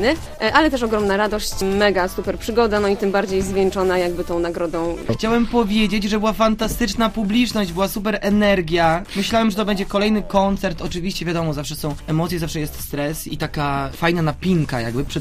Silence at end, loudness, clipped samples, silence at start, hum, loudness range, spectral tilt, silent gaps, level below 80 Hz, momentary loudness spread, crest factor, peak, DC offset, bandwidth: 0 s; -20 LUFS; under 0.1%; 0 s; none; 4 LU; -5.5 dB/octave; none; -34 dBFS; 7 LU; 18 dB; 0 dBFS; 0.4%; 15.5 kHz